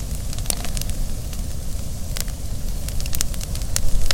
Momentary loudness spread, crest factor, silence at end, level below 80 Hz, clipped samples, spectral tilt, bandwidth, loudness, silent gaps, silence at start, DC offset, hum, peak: 6 LU; 20 dB; 0 s; -26 dBFS; under 0.1%; -3 dB/octave; 17 kHz; -27 LUFS; none; 0 s; under 0.1%; none; 0 dBFS